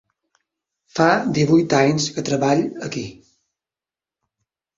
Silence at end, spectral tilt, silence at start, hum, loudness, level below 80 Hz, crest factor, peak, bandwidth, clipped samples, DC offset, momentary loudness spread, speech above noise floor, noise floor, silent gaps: 1.65 s; -5.5 dB/octave; 0.95 s; none; -19 LUFS; -58 dBFS; 20 dB; 0 dBFS; 7.8 kHz; under 0.1%; under 0.1%; 14 LU; over 72 dB; under -90 dBFS; none